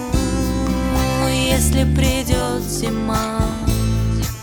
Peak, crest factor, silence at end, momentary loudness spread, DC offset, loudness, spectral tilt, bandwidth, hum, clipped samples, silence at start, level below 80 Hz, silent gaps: -2 dBFS; 16 dB; 0 s; 5 LU; under 0.1%; -19 LUFS; -5 dB/octave; 19.5 kHz; none; under 0.1%; 0 s; -24 dBFS; none